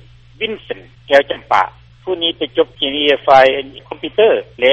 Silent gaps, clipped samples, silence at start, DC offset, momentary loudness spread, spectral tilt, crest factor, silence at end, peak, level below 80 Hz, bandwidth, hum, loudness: none; under 0.1%; 0.4 s; under 0.1%; 17 LU; -4.5 dB/octave; 16 dB; 0 s; 0 dBFS; -48 dBFS; 8.4 kHz; none; -14 LUFS